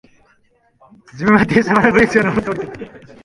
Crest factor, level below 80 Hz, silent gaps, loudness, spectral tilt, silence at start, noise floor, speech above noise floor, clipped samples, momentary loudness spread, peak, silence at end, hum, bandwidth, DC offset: 16 dB; -44 dBFS; none; -14 LUFS; -6.5 dB/octave; 1.15 s; -58 dBFS; 42 dB; under 0.1%; 18 LU; 0 dBFS; 0.25 s; none; 11.5 kHz; under 0.1%